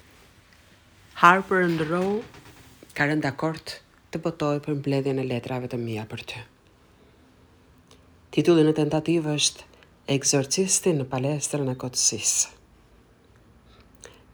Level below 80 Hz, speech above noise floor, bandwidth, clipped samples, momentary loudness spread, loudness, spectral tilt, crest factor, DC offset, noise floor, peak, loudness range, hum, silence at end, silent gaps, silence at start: -60 dBFS; 33 dB; over 20 kHz; under 0.1%; 17 LU; -24 LUFS; -4 dB/octave; 26 dB; under 0.1%; -57 dBFS; -2 dBFS; 7 LU; none; 0.25 s; none; 1.15 s